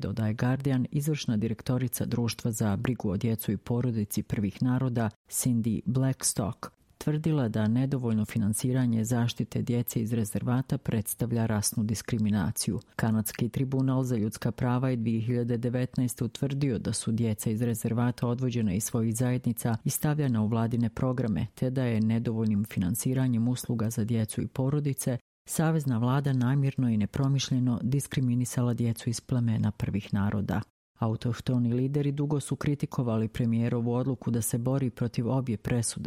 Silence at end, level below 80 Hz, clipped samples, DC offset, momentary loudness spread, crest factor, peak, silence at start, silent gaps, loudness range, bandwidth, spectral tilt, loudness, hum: 0 s; -56 dBFS; under 0.1%; under 0.1%; 4 LU; 18 dB; -10 dBFS; 0 s; 5.16-5.25 s, 25.21-25.45 s, 30.70-30.95 s; 2 LU; 16.5 kHz; -6 dB/octave; -29 LUFS; none